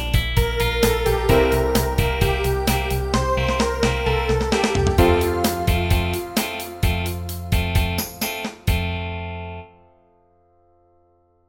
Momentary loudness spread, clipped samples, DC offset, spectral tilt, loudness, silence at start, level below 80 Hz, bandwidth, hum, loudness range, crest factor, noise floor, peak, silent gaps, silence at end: 9 LU; under 0.1%; under 0.1%; -5 dB/octave; -21 LUFS; 0 s; -28 dBFS; 17 kHz; none; 6 LU; 18 dB; -60 dBFS; -2 dBFS; none; 1.85 s